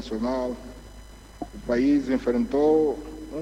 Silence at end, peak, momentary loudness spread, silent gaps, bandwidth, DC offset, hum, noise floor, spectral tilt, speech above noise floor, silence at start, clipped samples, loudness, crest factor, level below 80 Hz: 0 s; -12 dBFS; 19 LU; none; 12.5 kHz; under 0.1%; none; -45 dBFS; -6.5 dB/octave; 21 dB; 0 s; under 0.1%; -24 LUFS; 14 dB; -44 dBFS